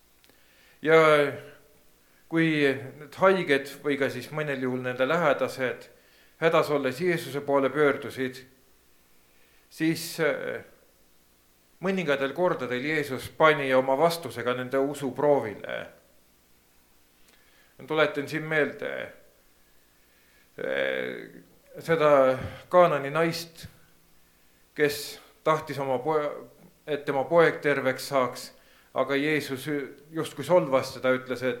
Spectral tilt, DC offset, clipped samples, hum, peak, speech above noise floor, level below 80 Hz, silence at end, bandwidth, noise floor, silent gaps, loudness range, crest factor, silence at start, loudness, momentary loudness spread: -5.5 dB/octave; under 0.1%; under 0.1%; none; -6 dBFS; 36 dB; -66 dBFS; 0 s; 18.5 kHz; -62 dBFS; none; 6 LU; 22 dB; 0.85 s; -26 LUFS; 14 LU